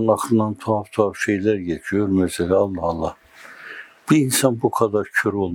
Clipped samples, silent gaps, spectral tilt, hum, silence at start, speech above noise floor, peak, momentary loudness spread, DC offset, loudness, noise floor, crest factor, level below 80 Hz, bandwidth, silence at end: under 0.1%; none; -5 dB/octave; none; 0 s; 22 dB; 0 dBFS; 12 LU; under 0.1%; -20 LUFS; -41 dBFS; 20 dB; -54 dBFS; 20 kHz; 0 s